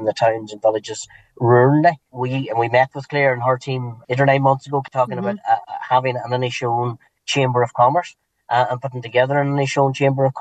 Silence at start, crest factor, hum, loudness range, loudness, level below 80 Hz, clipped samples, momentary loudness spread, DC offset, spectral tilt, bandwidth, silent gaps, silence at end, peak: 0 s; 18 dB; none; 2 LU; -19 LUFS; -66 dBFS; under 0.1%; 11 LU; under 0.1%; -6 dB/octave; 8.8 kHz; none; 0 s; -2 dBFS